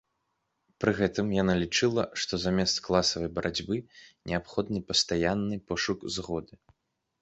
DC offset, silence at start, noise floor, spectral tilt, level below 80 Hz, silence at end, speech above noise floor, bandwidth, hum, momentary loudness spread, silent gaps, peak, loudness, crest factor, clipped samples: under 0.1%; 0.8 s; -79 dBFS; -4 dB/octave; -52 dBFS; 0.75 s; 50 dB; 8.2 kHz; none; 8 LU; none; -8 dBFS; -29 LUFS; 22 dB; under 0.1%